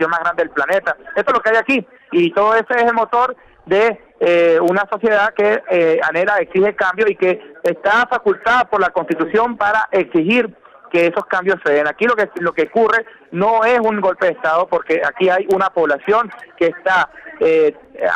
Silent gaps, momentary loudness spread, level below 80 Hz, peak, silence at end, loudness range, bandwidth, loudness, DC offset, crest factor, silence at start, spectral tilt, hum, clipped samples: none; 5 LU; -56 dBFS; -6 dBFS; 0 s; 1 LU; 12 kHz; -16 LUFS; under 0.1%; 10 dB; 0 s; -6 dB/octave; none; under 0.1%